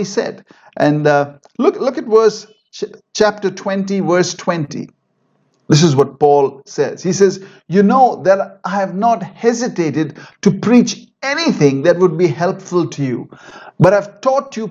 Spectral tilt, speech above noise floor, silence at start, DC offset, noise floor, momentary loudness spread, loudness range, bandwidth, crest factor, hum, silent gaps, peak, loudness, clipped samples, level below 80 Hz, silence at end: -6 dB/octave; 47 dB; 0 s; under 0.1%; -62 dBFS; 12 LU; 3 LU; 8 kHz; 14 dB; none; none; 0 dBFS; -15 LUFS; under 0.1%; -56 dBFS; 0 s